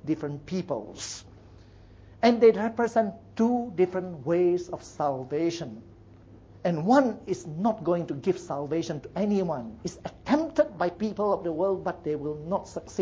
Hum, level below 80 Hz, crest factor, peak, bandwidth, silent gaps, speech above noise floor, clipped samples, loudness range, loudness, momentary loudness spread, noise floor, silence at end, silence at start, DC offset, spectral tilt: none; -58 dBFS; 20 dB; -8 dBFS; 8 kHz; none; 24 dB; under 0.1%; 4 LU; -27 LUFS; 14 LU; -51 dBFS; 0 s; 0.05 s; under 0.1%; -6.5 dB/octave